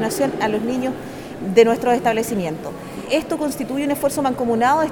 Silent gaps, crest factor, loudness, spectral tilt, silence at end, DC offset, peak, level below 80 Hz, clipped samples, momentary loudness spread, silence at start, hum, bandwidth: none; 18 dB; -20 LUFS; -5 dB/octave; 0 s; under 0.1%; 0 dBFS; -52 dBFS; under 0.1%; 14 LU; 0 s; none; over 20 kHz